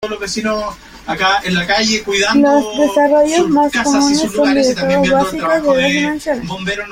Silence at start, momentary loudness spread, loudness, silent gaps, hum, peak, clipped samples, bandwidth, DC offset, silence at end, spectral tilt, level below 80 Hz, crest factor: 0 s; 9 LU; -14 LUFS; none; none; -2 dBFS; under 0.1%; 16 kHz; under 0.1%; 0 s; -4 dB/octave; -42 dBFS; 12 dB